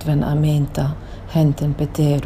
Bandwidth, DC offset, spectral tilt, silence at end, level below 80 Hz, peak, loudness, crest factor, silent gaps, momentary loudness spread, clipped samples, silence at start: 15 kHz; under 0.1%; -8 dB/octave; 0 s; -34 dBFS; -6 dBFS; -19 LUFS; 12 dB; none; 6 LU; under 0.1%; 0 s